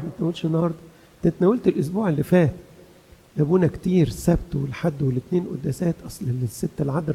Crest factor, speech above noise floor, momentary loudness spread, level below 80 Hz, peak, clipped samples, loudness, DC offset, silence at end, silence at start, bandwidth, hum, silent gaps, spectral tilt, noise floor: 18 dB; 29 dB; 9 LU; -44 dBFS; -6 dBFS; under 0.1%; -23 LUFS; under 0.1%; 0 s; 0 s; 15 kHz; none; none; -8 dB/octave; -51 dBFS